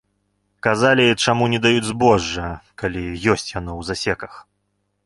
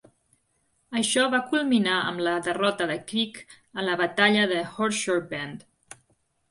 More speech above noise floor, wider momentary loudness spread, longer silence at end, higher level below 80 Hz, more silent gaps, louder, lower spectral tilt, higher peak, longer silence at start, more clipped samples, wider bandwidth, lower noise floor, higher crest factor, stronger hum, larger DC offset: first, 52 dB vs 45 dB; about the same, 13 LU vs 13 LU; second, 0.65 s vs 0.9 s; first, -42 dBFS vs -70 dBFS; neither; first, -19 LUFS vs -25 LUFS; about the same, -4.5 dB/octave vs -3.5 dB/octave; first, -2 dBFS vs -6 dBFS; second, 0.65 s vs 0.9 s; neither; about the same, 11.5 kHz vs 11.5 kHz; about the same, -71 dBFS vs -71 dBFS; about the same, 18 dB vs 20 dB; first, 50 Hz at -45 dBFS vs none; neither